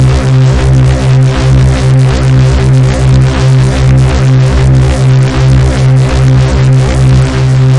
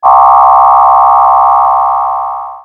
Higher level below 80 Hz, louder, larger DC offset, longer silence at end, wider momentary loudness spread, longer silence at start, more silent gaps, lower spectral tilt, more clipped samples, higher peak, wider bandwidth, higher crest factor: first, -14 dBFS vs -42 dBFS; about the same, -7 LUFS vs -6 LUFS; first, 0.9% vs under 0.1%; about the same, 0 s vs 0.05 s; second, 0 LU vs 9 LU; about the same, 0 s vs 0 s; neither; first, -7 dB/octave vs -5 dB/octave; neither; about the same, 0 dBFS vs 0 dBFS; first, 10.5 kHz vs 3.8 kHz; about the same, 6 dB vs 6 dB